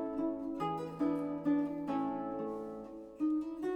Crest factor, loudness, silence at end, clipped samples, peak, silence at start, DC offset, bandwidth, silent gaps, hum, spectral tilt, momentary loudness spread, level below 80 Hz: 14 dB; -37 LUFS; 0 s; under 0.1%; -22 dBFS; 0 s; under 0.1%; 8.4 kHz; none; none; -8 dB/octave; 9 LU; -68 dBFS